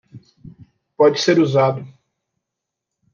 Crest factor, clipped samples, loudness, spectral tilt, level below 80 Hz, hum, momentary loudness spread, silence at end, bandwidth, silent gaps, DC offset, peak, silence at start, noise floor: 16 dB; under 0.1%; -16 LUFS; -5.5 dB/octave; -64 dBFS; none; 6 LU; 1.25 s; 7.2 kHz; none; under 0.1%; -4 dBFS; 0.15 s; -82 dBFS